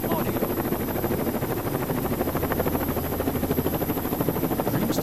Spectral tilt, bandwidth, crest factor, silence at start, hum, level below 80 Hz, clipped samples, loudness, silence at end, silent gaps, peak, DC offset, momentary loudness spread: -6 dB/octave; 14 kHz; 16 dB; 0 s; none; -42 dBFS; under 0.1%; -26 LUFS; 0 s; none; -8 dBFS; under 0.1%; 2 LU